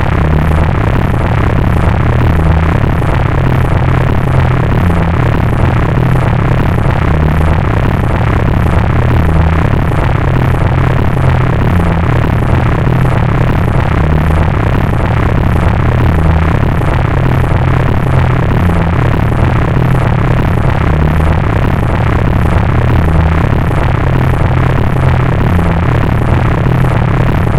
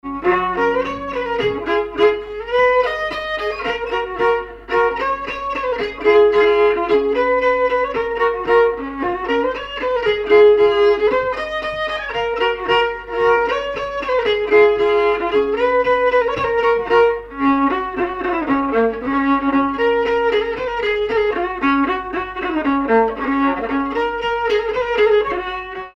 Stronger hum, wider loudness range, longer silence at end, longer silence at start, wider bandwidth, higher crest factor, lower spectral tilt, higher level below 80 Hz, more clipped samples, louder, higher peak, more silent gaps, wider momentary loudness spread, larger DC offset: neither; second, 0 LU vs 3 LU; about the same, 0 s vs 0.1 s; about the same, 0 s vs 0.05 s; first, 13 kHz vs 6.6 kHz; second, 8 dB vs 14 dB; first, -8.5 dB/octave vs -5.5 dB/octave; first, -16 dBFS vs -42 dBFS; first, 0.4% vs under 0.1%; first, -11 LUFS vs -17 LUFS; about the same, 0 dBFS vs -2 dBFS; neither; second, 1 LU vs 8 LU; neither